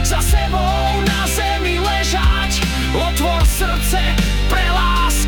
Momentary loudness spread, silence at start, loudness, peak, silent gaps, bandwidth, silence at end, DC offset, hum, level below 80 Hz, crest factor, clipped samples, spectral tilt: 2 LU; 0 s; -17 LUFS; -4 dBFS; none; 19 kHz; 0 s; under 0.1%; none; -18 dBFS; 10 dB; under 0.1%; -4 dB/octave